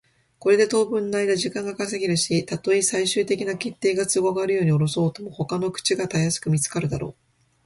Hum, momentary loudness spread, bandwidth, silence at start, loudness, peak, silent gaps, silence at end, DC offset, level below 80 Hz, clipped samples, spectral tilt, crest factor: none; 8 LU; 11.5 kHz; 0.4 s; -23 LUFS; -6 dBFS; none; 0.55 s; under 0.1%; -56 dBFS; under 0.1%; -4.5 dB/octave; 16 dB